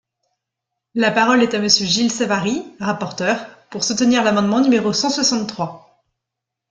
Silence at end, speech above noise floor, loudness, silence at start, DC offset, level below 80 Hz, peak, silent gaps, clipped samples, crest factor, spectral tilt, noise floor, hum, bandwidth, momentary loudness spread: 0.95 s; 65 dB; -17 LUFS; 0.95 s; under 0.1%; -60 dBFS; -2 dBFS; none; under 0.1%; 18 dB; -3.5 dB/octave; -82 dBFS; none; 9.2 kHz; 10 LU